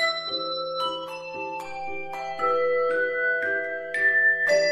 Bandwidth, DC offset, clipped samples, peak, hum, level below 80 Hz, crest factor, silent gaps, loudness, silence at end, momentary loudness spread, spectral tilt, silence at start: 14 kHz; under 0.1%; under 0.1%; -12 dBFS; none; -66 dBFS; 14 dB; none; -25 LUFS; 0 s; 14 LU; -2 dB/octave; 0 s